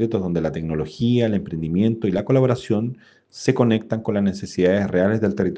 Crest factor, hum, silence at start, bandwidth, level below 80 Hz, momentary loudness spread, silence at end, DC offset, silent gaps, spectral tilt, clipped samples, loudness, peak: 18 dB; none; 0 s; 9 kHz; -50 dBFS; 6 LU; 0 s; under 0.1%; none; -7.5 dB/octave; under 0.1%; -21 LUFS; -2 dBFS